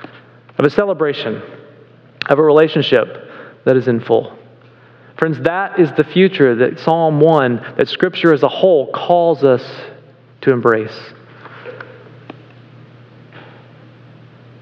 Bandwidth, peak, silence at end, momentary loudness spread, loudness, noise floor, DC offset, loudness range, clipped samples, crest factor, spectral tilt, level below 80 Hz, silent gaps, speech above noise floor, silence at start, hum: 6.6 kHz; 0 dBFS; 1.2 s; 21 LU; -14 LUFS; -44 dBFS; under 0.1%; 8 LU; 0.1%; 16 dB; -8 dB/octave; -60 dBFS; none; 31 dB; 0.6 s; none